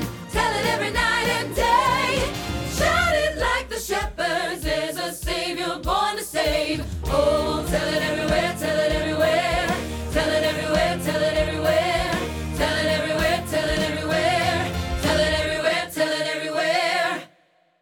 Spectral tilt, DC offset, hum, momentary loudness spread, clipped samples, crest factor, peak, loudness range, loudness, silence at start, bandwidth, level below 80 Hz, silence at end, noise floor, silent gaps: -4 dB/octave; under 0.1%; none; 6 LU; under 0.1%; 16 dB; -6 dBFS; 2 LU; -22 LUFS; 0 s; 19 kHz; -36 dBFS; 0.55 s; -61 dBFS; none